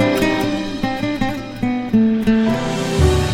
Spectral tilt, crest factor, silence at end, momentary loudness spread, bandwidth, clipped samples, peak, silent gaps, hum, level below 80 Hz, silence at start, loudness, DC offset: -6 dB/octave; 14 dB; 0 s; 7 LU; 17 kHz; under 0.1%; -2 dBFS; none; none; -28 dBFS; 0 s; -18 LUFS; under 0.1%